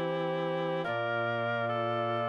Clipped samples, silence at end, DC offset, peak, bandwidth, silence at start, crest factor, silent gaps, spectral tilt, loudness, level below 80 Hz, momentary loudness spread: under 0.1%; 0 s; under 0.1%; -20 dBFS; 7.6 kHz; 0 s; 12 dB; none; -7.5 dB/octave; -32 LUFS; -78 dBFS; 1 LU